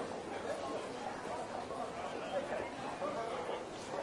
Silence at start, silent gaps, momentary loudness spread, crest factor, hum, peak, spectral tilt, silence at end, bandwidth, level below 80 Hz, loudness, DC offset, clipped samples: 0 s; none; 3 LU; 16 dB; none; -26 dBFS; -4 dB/octave; 0 s; 11.5 kHz; -68 dBFS; -41 LUFS; under 0.1%; under 0.1%